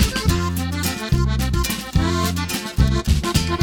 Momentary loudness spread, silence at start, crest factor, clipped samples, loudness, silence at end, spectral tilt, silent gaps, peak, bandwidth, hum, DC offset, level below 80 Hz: 4 LU; 0 s; 18 dB; under 0.1%; -21 LUFS; 0 s; -5 dB/octave; none; -2 dBFS; over 20 kHz; none; under 0.1%; -24 dBFS